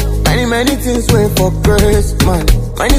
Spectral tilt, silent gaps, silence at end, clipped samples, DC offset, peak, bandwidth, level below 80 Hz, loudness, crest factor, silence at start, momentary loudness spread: -5 dB/octave; none; 0 s; under 0.1%; under 0.1%; 0 dBFS; 16 kHz; -16 dBFS; -12 LUFS; 10 dB; 0 s; 3 LU